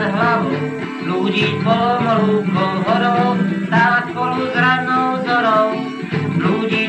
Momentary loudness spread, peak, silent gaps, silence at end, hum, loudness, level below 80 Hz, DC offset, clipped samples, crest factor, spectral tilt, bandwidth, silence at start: 7 LU; -4 dBFS; none; 0 s; none; -17 LUFS; -58 dBFS; under 0.1%; under 0.1%; 12 dB; -7 dB/octave; 8.6 kHz; 0 s